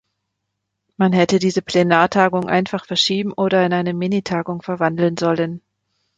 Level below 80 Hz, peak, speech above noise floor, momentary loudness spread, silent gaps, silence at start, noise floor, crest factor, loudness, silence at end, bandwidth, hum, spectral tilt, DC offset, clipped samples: -58 dBFS; -2 dBFS; 59 dB; 7 LU; none; 1 s; -77 dBFS; 18 dB; -18 LUFS; 0.6 s; 9 kHz; none; -5.5 dB/octave; under 0.1%; under 0.1%